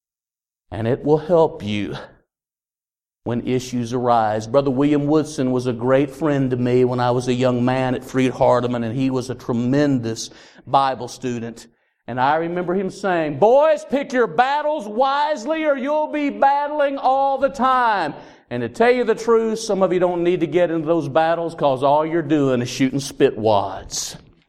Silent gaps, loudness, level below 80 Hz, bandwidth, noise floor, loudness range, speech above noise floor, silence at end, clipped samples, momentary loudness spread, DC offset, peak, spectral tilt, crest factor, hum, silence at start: none; -19 LUFS; -52 dBFS; 14.5 kHz; under -90 dBFS; 4 LU; over 71 dB; 0.3 s; under 0.1%; 9 LU; under 0.1%; -2 dBFS; -6 dB/octave; 18 dB; none; 0.7 s